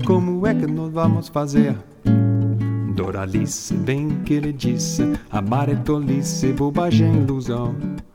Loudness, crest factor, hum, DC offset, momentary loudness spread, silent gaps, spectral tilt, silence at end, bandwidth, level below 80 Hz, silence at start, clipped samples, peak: -20 LUFS; 16 dB; none; under 0.1%; 6 LU; none; -6.5 dB/octave; 0.15 s; 16 kHz; -42 dBFS; 0 s; under 0.1%; -4 dBFS